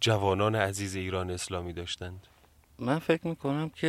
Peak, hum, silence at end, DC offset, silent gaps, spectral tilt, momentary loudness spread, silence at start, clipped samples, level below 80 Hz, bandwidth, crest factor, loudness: -10 dBFS; none; 0 s; under 0.1%; none; -5 dB/octave; 11 LU; 0 s; under 0.1%; -62 dBFS; 15.5 kHz; 20 dB; -31 LUFS